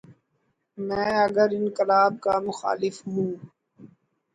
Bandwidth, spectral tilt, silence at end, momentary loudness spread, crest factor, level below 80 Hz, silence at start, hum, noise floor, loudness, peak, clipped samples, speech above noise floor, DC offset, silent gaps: 9.4 kHz; -6 dB/octave; 0.5 s; 10 LU; 18 dB; -64 dBFS; 0.1 s; none; -73 dBFS; -24 LUFS; -8 dBFS; under 0.1%; 49 dB; under 0.1%; none